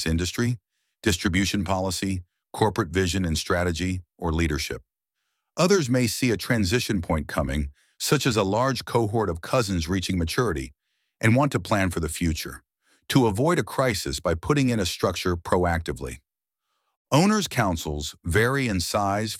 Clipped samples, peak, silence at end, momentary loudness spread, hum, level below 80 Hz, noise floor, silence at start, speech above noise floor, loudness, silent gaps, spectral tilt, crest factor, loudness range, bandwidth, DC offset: under 0.1%; -4 dBFS; 0 s; 9 LU; none; -40 dBFS; -83 dBFS; 0 s; 59 dB; -24 LUFS; 16.97-17.05 s; -5 dB/octave; 20 dB; 2 LU; 16.5 kHz; under 0.1%